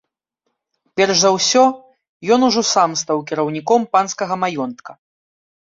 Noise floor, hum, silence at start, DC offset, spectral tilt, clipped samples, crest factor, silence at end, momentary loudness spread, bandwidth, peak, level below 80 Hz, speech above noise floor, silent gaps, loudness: -74 dBFS; none; 0.95 s; under 0.1%; -3 dB/octave; under 0.1%; 16 dB; 0.85 s; 14 LU; 7.8 kHz; -2 dBFS; -64 dBFS; 58 dB; 2.09-2.20 s; -16 LUFS